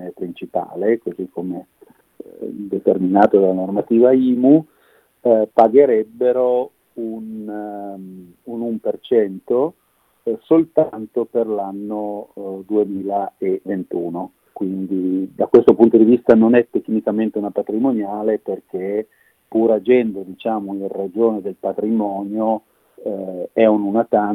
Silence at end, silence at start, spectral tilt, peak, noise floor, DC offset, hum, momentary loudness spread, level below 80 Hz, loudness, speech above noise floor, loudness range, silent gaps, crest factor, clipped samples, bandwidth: 0 s; 0 s; -9.5 dB/octave; 0 dBFS; -56 dBFS; under 0.1%; none; 16 LU; -62 dBFS; -18 LUFS; 39 dB; 8 LU; none; 18 dB; under 0.1%; 4.3 kHz